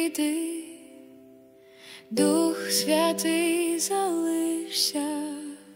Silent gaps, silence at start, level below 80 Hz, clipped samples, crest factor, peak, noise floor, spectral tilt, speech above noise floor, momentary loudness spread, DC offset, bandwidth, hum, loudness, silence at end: none; 0 s; -76 dBFS; under 0.1%; 16 dB; -10 dBFS; -53 dBFS; -2.5 dB/octave; 27 dB; 15 LU; under 0.1%; 16.5 kHz; none; -25 LUFS; 0 s